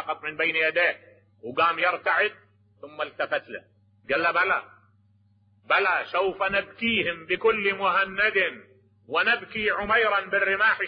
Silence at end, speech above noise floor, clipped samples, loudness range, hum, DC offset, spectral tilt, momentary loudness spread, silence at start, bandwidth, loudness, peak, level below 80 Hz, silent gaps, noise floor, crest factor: 0 s; 37 dB; under 0.1%; 4 LU; none; under 0.1%; -7 dB/octave; 9 LU; 0 s; 5.2 kHz; -24 LUFS; -8 dBFS; -60 dBFS; none; -62 dBFS; 18 dB